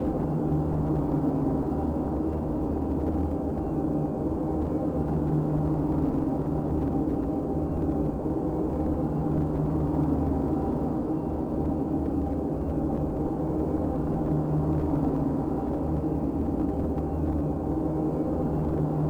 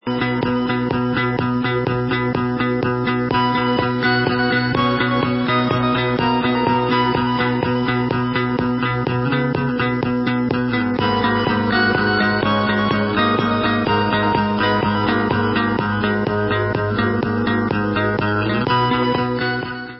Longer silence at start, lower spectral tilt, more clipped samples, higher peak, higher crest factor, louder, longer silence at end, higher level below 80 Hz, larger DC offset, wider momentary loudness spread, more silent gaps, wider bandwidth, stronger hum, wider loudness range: about the same, 0 s vs 0.05 s; about the same, -11 dB/octave vs -11 dB/octave; neither; second, -14 dBFS vs -4 dBFS; about the same, 12 dB vs 14 dB; second, -28 LUFS vs -18 LUFS; about the same, 0 s vs 0 s; first, -36 dBFS vs -42 dBFS; neither; about the same, 3 LU vs 3 LU; neither; second, 5 kHz vs 5.8 kHz; neither; about the same, 1 LU vs 2 LU